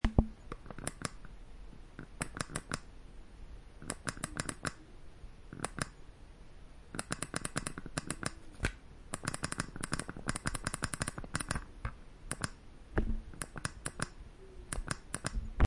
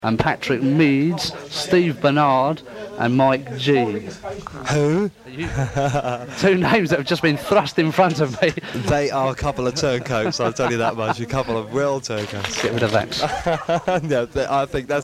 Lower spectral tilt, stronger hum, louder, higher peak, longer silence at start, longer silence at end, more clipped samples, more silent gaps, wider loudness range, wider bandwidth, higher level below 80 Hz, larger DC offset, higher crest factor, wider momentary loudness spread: second, -4 dB/octave vs -5.5 dB/octave; neither; second, -40 LUFS vs -20 LUFS; second, -8 dBFS vs -2 dBFS; about the same, 0.05 s vs 0 s; about the same, 0 s vs 0 s; neither; neither; about the same, 5 LU vs 3 LU; second, 11.5 kHz vs 15.5 kHz; about the same, -44 dBFS vs -44 dBFS; neither; first, 32 dB vs 18 dB; first, 18 LU vs 8 LU